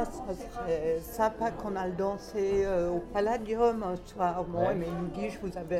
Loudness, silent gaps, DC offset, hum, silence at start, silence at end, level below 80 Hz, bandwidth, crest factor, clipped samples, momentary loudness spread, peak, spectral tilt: -31 LUFS; none; under 0.1%; none; 0 s; 0 s; -48 dBFS; 15.5 kHz; 16 dB; under 0.1%; 8 LU; -14 dBFS; -6.5 dB/octave